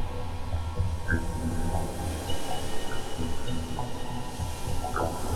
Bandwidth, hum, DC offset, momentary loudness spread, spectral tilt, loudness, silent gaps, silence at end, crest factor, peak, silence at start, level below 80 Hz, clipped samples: 14 kHz; none; under 0.1%; 5 LU; -5 dB/octave; -33 LUFS; none; 0 s; 16 dB; -12 dBFS; 0 s; -34 dBFS; under 0.1%